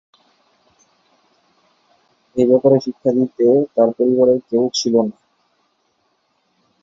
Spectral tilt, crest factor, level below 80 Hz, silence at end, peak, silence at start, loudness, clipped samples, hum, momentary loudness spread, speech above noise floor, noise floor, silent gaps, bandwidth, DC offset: -6.5 dB/octave; 16 dB; -64 dBFS; 1.7 s; -2 dBFS; 2.35 s; -16 LUFS; under 0.1%; none; 5 LU; 50 dB; -65 dBFS; none; 7.6 kHz; under 0.1%